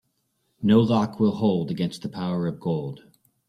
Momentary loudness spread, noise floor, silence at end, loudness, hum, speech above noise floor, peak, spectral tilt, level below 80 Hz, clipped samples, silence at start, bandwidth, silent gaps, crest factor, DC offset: 10 LU; -72 dBFS; 0.5 s; -24 LUFS; none; 50 dB; -6 dBFS; -8 dB/octave; -58 dBFS; under 0.1%; 0.6 s; 11 kHz; none; 18 dB; under 0.1%